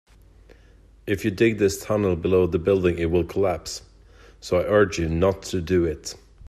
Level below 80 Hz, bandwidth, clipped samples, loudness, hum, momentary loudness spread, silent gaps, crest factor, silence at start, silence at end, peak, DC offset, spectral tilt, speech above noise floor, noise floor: -46 dBFS; 14.5 kHz; under 0.1%; -22 LUFS; none; 14 LU; none; 18 dB; 1.05 s; 0 s; -6 dBFS; under 0.1%; -6 dB/octave; 30 dB; -51 dBFS